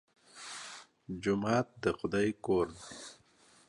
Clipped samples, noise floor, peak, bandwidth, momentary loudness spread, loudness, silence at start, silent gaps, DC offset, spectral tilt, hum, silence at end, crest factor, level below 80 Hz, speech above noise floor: under 0.1%; -64 dBFS; -16 dBFS; 11.5 kHz; 17 LU; -34 LUFS; 0.35 s; none; under 0.1%; -5.5 dB/octave; none; 0.55 s; 20 dB; -62 dBFS; 31 dB